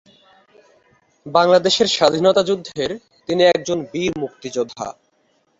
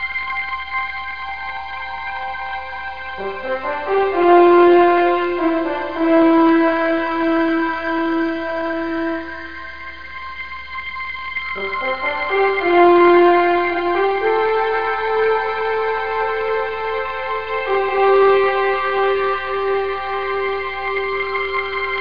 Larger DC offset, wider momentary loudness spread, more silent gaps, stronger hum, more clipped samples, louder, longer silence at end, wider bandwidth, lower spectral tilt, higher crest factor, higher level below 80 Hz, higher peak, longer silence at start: second, under 0.1% vs 1%; about the same, 13 LU vs 14 LU; neither; neither; neither; about the same, -18 LUFS vs -18 LUFS; first, 0.7 s vs 0 s; first, 8 kHz vs 5.2 kHz; second, -4 dB/octave vs -6.5 dB/octave; about the same, 18 dB vs 16 dB; second, -56 dBFS vs -48 dBFS; about the same, -2 dBFS vs -2 dBFS; first, 1.25 s vs 0 s